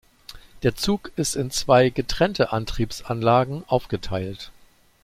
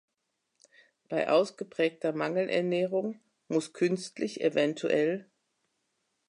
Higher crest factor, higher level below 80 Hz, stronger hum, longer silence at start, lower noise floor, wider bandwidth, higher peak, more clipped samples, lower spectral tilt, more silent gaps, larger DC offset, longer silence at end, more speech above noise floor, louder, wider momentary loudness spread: about the same, 20 dB vs 18 dB; first, -40 dBFS vs -84 dBFS; neither; second, 0.3 s vs 1.1 s; second, -45 dBFS vs -81 dBFS; first, 16 kHz vs 11 kHz; first, -4 dBFS vs -14 dBFS; neither; about the same, -5 dB/octave vs -5.5 dB/octave; neither; neither; second, 0.5 s vs 1.05 s; second, 23 dB vs 52 dB; first, -23 LUFS vs -30 LUFS; first, 12 LU vs 8 LU